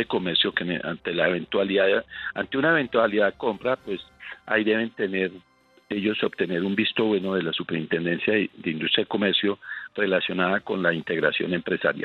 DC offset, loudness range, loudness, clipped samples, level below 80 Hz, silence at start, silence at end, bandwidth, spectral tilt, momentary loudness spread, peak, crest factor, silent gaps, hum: under 0.1%; 3 LU; -24 LUFS; under 0.1%; -64 dBFS; 0 s; 0 s; 5.4 kHz; -7.5 dB/octave; 7 LU; -6 dBFS; 18 dB; none; none